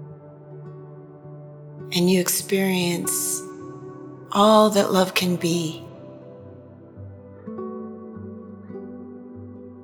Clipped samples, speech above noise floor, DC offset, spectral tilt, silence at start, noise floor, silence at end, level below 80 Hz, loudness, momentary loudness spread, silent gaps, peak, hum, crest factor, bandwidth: under 0.1%; 24 dB; under 0.1%; -4 dB/octave; 0 s; -44 dBFS; 0 s; -72 dBFS; -21 LUFS; 24 LU; none; -2 dBFS; none; 22 dB; over 20 kHz